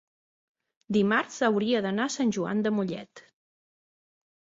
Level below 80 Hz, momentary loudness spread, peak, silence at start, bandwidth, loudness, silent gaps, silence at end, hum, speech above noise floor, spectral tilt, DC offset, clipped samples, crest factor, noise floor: -70 dBFS; 6 LU; -10 dBFS; 0.9 s; 7.8 kHz; -27 LUFS; none; 1.4 s; none; over 64 dB; -5 dB/octave; under 0.1%; under 0.1%; 18 dB; under -90 dBFS